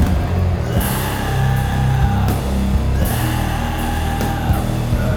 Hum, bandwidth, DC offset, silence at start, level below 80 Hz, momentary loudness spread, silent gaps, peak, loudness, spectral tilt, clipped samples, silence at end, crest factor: none; over 20 kHz; under 0.1%; 0 s; -22 dBFS; 3 LU; none; -2 dBFS; -18 LUFS; -6 dB/octave; under 0.1%; 0 s; 14 dB